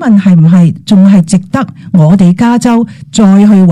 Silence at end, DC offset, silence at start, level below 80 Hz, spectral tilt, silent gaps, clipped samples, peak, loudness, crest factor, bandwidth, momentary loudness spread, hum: 0 s; under 0.1%; 0 s; -42 dBFS; -7.5 dB/octave; none; 2%; 0 dBFS; -6 LUFS; 6 dB; 11 kHz; 7 LU; none